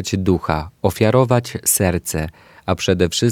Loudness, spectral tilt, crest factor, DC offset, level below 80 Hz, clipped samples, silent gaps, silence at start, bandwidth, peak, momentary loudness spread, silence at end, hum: -18 LUFS; -4.5 dB/octave; 18 dB; under 0.1%; -38 dBFS; under 0.1%; none; 0 s; 18.5 kHz; 0 dBFS; 9 LU; 0 s; none